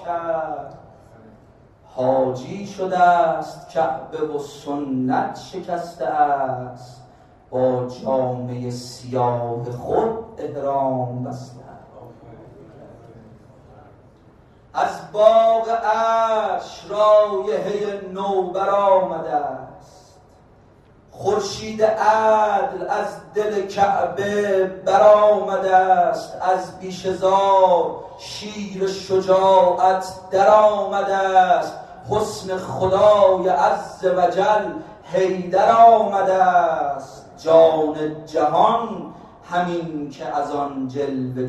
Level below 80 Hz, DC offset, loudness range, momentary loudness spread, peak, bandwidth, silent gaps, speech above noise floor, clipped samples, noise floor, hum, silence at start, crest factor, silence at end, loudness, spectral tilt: -56 dBFS; under 0.1%; 8 LU; 15 LU; -2 dBFS; 12 kHz; none; 32 dB; under 0.1%; -50 dBFS; none; 0 s; 18 dB; 0 s; -19 LUFS; -5.5 dB/octave